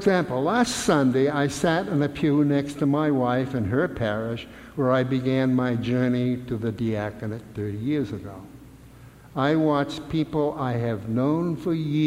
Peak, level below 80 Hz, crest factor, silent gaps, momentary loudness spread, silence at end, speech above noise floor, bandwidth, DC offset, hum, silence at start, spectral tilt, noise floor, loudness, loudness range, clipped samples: -8 dBFS; -52 dBFS; 16 dB; none; 11 LU; 0 s; 23 dB; 15.5 kHz; under 0.1%; none; 0 s; -6.5 dB/octave; -47 dBFS; -24 LUFS; 5 LU; under 0.1%